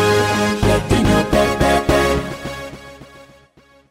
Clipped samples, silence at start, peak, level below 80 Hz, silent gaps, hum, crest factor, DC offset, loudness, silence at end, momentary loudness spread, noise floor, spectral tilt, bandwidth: under 0.1%; 0 s; -2 dBFS; -30 dBFS; none; none; 16 dB; under 0.1%; -16 LUFS; 0.7 s; 14 LU; -51 dBFS; -5 dB/octave; 16 kHz